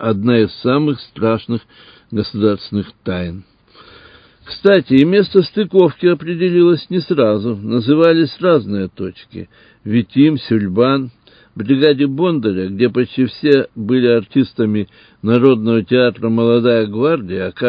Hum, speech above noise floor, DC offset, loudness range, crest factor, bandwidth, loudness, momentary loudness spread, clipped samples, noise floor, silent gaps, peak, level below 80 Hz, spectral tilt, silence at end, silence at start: none; 30 dB; under 0.1%; 5 LU; 14 dB; 5.2 kHz; -15 LUFS; 12 LU; under 0.1%; -44 dBFS; none; 0 dBFS; -48 dBFS; -9.5 dB/octave; 0 s; 0 s